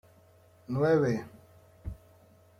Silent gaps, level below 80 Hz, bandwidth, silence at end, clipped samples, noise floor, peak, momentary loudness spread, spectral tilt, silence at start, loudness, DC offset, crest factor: none; -54 dBFS; 14.5 kHz; 0.65 s; under 0.1%; -60 dBFS; -14 dBFS; 24 LU; -8 dB/octave; 0.7 s; -28 LUFS; under 0.1%; 18 dB